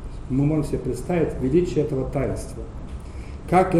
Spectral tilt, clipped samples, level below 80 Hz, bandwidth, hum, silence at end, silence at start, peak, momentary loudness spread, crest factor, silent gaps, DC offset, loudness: -8 dB/octave; under 0.1%; -34 dBFS; 13.5 kHz; none; 0 s; 0 s; -6 dBFS; 16 LU; 18 dB; none; under 0.1%; -23 LUFS